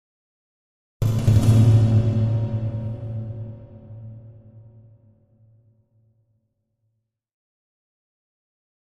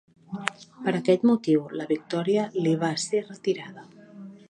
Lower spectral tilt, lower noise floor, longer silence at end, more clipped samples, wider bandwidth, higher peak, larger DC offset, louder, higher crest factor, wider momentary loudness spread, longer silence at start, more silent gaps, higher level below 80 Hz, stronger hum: first, -8.5 dB/octave vs -5.5 dB/octave; first, -74 dBFS vs -45 dBFS; first, 4.6 s vs 0.15 s; neither; about the same, 11.5 kHz vs 11 kHz; about the same, -4 dBFS vs -2 dBFS; neither; first, -20 LUFS vs -26 LUFS; about the same, 20 dB vs 24 dB; first, 25 LU vs 13 LU; first, 1 s vs 0.3 s; neither; first, -42 dBFS vs -74 dBFS; neither